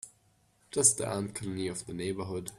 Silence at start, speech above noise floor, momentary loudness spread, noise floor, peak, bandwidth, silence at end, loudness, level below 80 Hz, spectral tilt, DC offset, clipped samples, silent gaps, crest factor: 0.05 s; 36 dB; 12 LU; -68 dBFS; -8 dBFS; 15.5 kHz; 0 s; -30 LUFS; -64 dBFS; -3.5 dB/octave; under 0.1%; under 0.1%; none; 24 dB